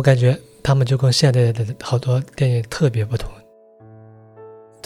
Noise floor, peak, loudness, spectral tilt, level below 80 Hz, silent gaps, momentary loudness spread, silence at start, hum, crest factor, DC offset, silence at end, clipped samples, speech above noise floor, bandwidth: -47 dBFS; -2 dBFS; -19 LUFS; -6 dB/octave; -42 dBFS; none; 10 LU; 0 s; none; 18 dB; under 0.1%; 0.3 s; under 0.1%; 30 dB; 12 kHz